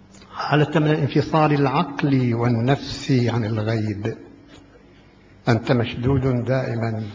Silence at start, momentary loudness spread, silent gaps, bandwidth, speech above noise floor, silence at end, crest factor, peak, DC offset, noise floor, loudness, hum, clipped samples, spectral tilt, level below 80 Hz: 0.2 s; 8 LU; none; 7.6 kHz; 29 dB; 0 s; 18 dB; -2 dBFS; under 0.1%; -49 dBFS; -21 LUFS; none; under 0.1%; -7.5 dB/octave; -46 dBFS